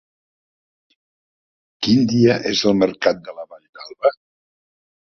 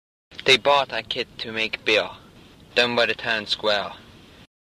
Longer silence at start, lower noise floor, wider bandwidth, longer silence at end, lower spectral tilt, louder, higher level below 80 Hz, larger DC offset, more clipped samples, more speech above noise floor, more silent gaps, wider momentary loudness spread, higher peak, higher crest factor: first, 1.8 s vs 0.3 s; first, under -90 dBFS vs -49 dBFS; second, 7 kHz vs 14.5 kHz; first, 0.9 s vs 0.7 s; first, -5.5 dB/octave vs -2.5 dB/octave; first, -18 LUFS vs -21 LUFS; about the same, -56 dBFS vs -58 dBFS; neither; neither; first, over 73 dB vs 26 dB; first, 3.69-3.73 s vs none; first, 22 LU vs 11 LU; about the same, -2 dBFS vs -4 dBFS; about the same, 20 dB vs 22 dB